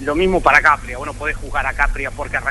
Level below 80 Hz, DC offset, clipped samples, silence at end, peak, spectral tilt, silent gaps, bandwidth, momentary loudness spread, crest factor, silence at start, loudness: -28 dBFS; under 0.1%; under 0.1%; 0 s; 0 dBFS; -5 dB/octave; none; 11.5 kHz; 12 LU; 18 dB; 0 s; -17 LUFS